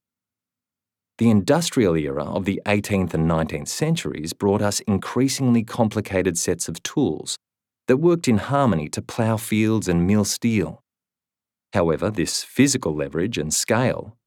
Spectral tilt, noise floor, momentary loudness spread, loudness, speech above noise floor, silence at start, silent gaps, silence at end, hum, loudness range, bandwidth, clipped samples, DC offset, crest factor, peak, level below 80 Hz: -5 dB/octave; -90 dBFS; 7 LU; -21 LUFS; 69 dB; 1.2 s; none; 0.15 s; none; 2 LU; 18 kHz; under 0.1%; under 0.1%; 18 dB; -4 dBFS; -48 dBFS